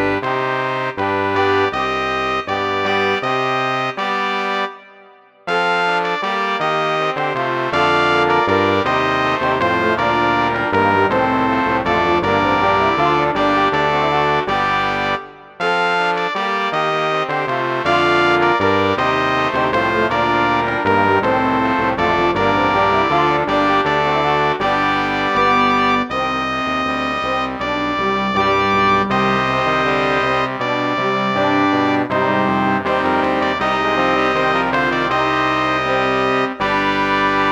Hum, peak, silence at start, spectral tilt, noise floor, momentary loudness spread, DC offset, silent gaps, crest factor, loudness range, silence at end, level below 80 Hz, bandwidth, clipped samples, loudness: none; -2 dBFS; 0 s; -5.5 dB/octave; -46 dBFS; 5 LU; under 0.1%; none; 14 dB; 3 LU; 0 s; -44 dBFS; 18.5 kHz; under 0.1%; -16 LUFS